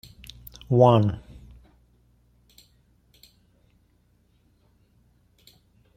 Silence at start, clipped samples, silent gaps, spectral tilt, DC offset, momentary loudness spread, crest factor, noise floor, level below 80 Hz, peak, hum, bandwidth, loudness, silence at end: 0.7 s; under 0.1%; none; -8.5 dB/octave; under 0.1%; 28 LU; 24 dB; -64 dBFS; -54 dBFS; -4 dBFS; 60 Hz at -60 dBFS; 16.5 kHz; -20 LUFS; 4.8 s